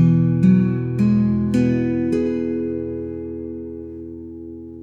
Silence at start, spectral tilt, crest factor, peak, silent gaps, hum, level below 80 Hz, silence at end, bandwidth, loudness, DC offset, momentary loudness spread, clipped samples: 0 s; -10 dB/octave; 14 dB; -4 dBFS; none; none; -48 dBFS; 0 s; 9.2 kHz; -19 LUFS; under 0.1%; 19 LU; under 0.1%